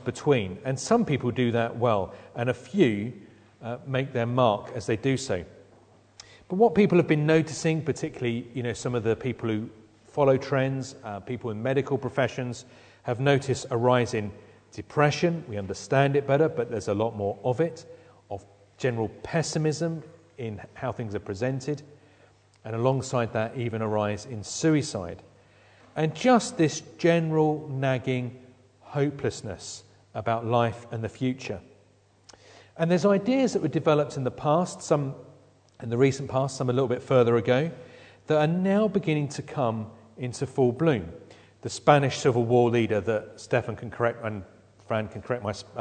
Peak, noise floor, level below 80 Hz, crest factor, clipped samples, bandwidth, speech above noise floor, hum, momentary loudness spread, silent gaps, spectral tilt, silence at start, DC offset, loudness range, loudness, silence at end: -4 dBFS; -61 dBFS; -62 dBFS; 24 dB; under 0.1%; 9.4 kHz; 35 dB; none; 15 LU; none; -6 dB/octave; 0 s; under 0.1%; 5 LU; -26 LUFS; 0 s